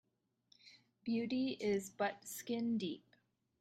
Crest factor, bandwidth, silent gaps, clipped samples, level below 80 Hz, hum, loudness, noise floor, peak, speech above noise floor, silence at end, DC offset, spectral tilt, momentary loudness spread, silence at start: 16 dB; 16 kHz; none; under 0.1%; -82 dBFS; none; -40 LUFS; -76 dBFS; -26 dBFS; 37 dB; 0.6 s; under 0.1%; -4.5 dB/octave; 10 LU; 0.65 s